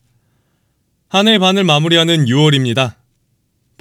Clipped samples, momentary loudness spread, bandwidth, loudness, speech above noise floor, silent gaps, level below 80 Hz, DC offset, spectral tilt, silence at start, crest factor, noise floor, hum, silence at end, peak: under 0.1%; 7 LU; 15.5 kHz; -12 LUFS; 51 dB; none; -64 dBFS; under 0.1%; -5 dB/octave; 1.15 s; 14 dB; -63 dBFS; none; 0.9 s; 0 dBFS